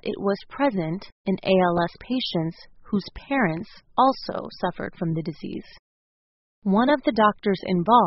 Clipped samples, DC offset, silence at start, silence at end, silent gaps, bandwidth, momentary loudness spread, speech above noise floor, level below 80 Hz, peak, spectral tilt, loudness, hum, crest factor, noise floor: under 0.1%; under 0.1%; 0.05 s; 0 s; 1.12-1.25 s, 5.79-6.62 s; 6 kHz; 12 LU; over 67 dB; -54 dBFS; -4 dBFS; -4.5 dB/octave; -24 LUFS; none; 20 dB; under -90 dBFS